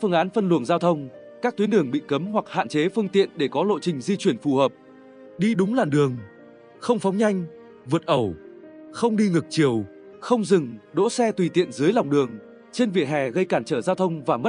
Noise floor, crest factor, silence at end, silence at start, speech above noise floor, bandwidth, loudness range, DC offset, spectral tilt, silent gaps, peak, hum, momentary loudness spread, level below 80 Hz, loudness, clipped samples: -48 dBFS; 18 dB; 0 s; 0 s; 26 dB; 10.5 kHz; 2 LU; under 0.1%; -6.5 dB/octave; none; -6 dBFS; none; 8 LU; -66 dBFS; -23 LUFS; under 0.1%